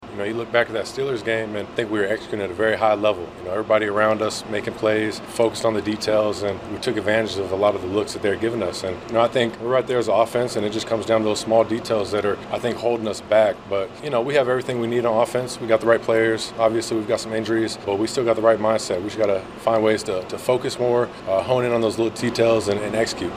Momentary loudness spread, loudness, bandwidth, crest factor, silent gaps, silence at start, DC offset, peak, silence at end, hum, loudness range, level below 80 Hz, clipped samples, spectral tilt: 7 LU; -21 LUFS; 15.5 kHz; 20 dB; none; 0 s; under 0.1%; -2 dBFS; 0 s; none; 2 LU; -54 dBFS; under 0.1%; -5 dB/octave